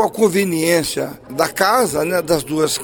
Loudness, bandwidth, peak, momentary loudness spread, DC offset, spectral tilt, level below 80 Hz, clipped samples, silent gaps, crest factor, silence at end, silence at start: -17 LUFS; over 20 kHz; 0 dBFS; 7 LU; under 0.1%; -4 dB/octave; -48 dBFS; under 0.1%; none; 18 dB; 0 s; 0 s